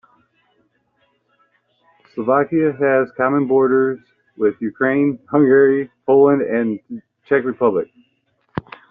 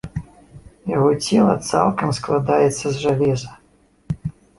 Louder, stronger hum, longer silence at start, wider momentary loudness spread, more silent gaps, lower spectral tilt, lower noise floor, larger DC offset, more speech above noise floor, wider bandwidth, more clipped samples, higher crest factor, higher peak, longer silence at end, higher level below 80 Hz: about the same, -17 LUFS vs -19 LUFS; neither; first, 2.15 s vs 0.05 s; first, 18 LU vs 15 LU; neither; first, -7.5 dB/octave vs -6 dB/octave; first, -64 dBFS vs -56 dBFS; neither; first, 48 dB vs 38 dB; second, 3.7 kHz vs 11.5 kHz; neither; about the same, 16 dB vs 18 dB; about the same, -2 dBFS vs -2 dBFS; about the same, 0.3 s vs 0.25 s; second, -60 dBFS vs -46 dBFS